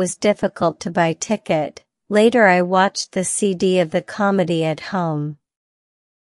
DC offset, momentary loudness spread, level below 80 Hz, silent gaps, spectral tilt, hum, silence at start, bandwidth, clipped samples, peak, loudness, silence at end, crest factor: under 0.1%; 9 LU; -60 dBFS; none; -4.5 dB/octave; none; 0 s; 12 kHz; under 0.1%; -2 dBFS; -18 LUFS; 0.9 s; 18 dB